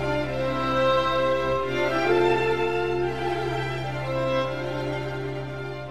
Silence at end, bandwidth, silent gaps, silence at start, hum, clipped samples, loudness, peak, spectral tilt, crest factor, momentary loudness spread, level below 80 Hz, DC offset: 0 s; 14.5 kHz; none; 0 s; none; under 0.1%; -25 LUFS; -10 dBFS; -6.5 dB/octave; 14 dB; 9 LU; -46 dBFS; 1%